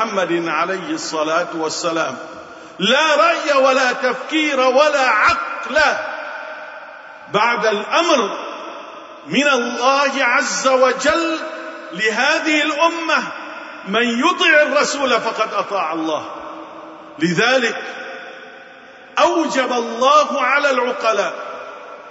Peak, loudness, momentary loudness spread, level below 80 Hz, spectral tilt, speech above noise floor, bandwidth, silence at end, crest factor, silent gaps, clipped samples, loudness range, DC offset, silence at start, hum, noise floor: -2 dBFS; -16 LUFS; 19 LU; -58 dBFS; -3 dB/octave; 24 dB; 8 kHz; 0 s; 16 dB; none; under 0.1%; 5 LU; under 0.1%; 0 s; none; -40 dBFS